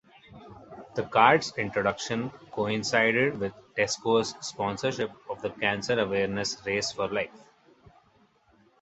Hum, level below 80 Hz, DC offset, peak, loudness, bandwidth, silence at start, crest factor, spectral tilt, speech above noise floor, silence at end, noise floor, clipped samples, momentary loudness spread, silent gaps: none; -62 dBFS; under 0.1%; -4 dBFS; -27 LUFS; 8.2 kHz; 0.3 s; 24 dB; -4 dB/octave; 36 dB; 1.45 s; -64 dBFS; under 0.1%; 13 LU; none